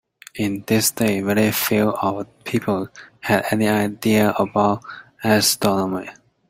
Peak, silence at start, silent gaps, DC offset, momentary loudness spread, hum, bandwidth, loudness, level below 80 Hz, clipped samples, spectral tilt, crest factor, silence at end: -2 dBFS; 0.35 s; none; under 0.1%; 12 LU; none; 16 kHz; -20 LUFS; -56 dBFS; under 0.1%; -4.5 dB/octave; 18 dB; 0.4 s